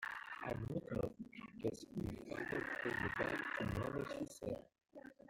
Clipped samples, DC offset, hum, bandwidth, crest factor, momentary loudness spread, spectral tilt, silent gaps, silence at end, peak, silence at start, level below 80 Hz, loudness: under 0.1%; under 0.1%; none; 16.5 kHz; 20 dB; 11 LU; -6 dB/octave; none; 0.15 s; -24 dBFS; 0 s; -62 dBFS; -44 LUFS